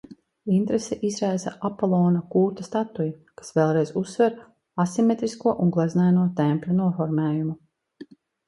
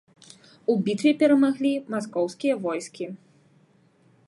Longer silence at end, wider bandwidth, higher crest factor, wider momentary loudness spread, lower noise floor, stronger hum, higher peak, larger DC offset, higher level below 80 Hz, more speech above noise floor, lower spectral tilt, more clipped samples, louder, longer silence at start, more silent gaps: second, 0.45 s vs 1.1 s; about the same, 11.5 kHz vs 11.5 kHz; about the same, 16 dB vs 16 dB; second, 9 LU vs 16 LU; second, -47 dBFS vs -60 dBFS; neither; about the same, -6 dBFS vs -8 dBFS; neither; first, -64 dBFS vs -76 dBFS; second, 24 dB vs 37 dB; first, -7.5 dB/octave vs -6 dB/octave; neither; about the same, -24 LUFS vs -24 LUFS; second, 0.1 s vs 0.7 s; neither